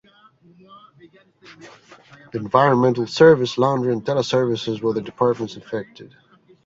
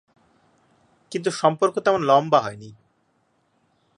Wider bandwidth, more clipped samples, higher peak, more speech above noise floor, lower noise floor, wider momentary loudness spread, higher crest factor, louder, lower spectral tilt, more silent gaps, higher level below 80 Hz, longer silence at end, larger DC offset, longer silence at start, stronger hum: second, 7.8 kHz vs 11.5 kHz; neither; about the same, -2 dBFS vs -4 dBFS; second, 32 dB vs 46 dB; second, -53 dBFS vs -67 dBFS; about the same, 17 LU vs 15 LU; about the same, 20 dB vs 20 dB; about the same, -19 LUFS vs -21 LUFS; first, -6.5 dB/octave vs -5 dB/octave; neither; first, -60 dBFS vs -68 dBFS; second, 0.6 s vs 1.25 s; neither; second, 0.7 s vs 1.1 s; neither